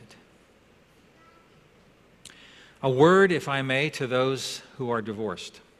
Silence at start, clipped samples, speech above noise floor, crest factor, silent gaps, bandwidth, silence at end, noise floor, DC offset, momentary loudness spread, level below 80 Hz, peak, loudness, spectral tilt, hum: 2.25 s; under 0.1%; 34 dB; 20 dB; none; 14 kHz; 0.2 s; -58 dBFS; under 0.1%; 15 LU; -66 dBFS; -6 dBFS; -24 LUFS; -5.5 dB/octave; none